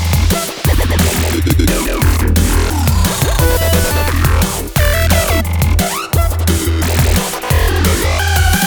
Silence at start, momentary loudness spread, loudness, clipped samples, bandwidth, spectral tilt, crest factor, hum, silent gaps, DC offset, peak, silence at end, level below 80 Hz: 0 s; 3 LU; -13 LUFS; under 0.1%; over 20 kHz; -4.5 dB/octave; 12 dB; none; none; under 0.1%; 0 dBFS; 0 s; -18 dBFS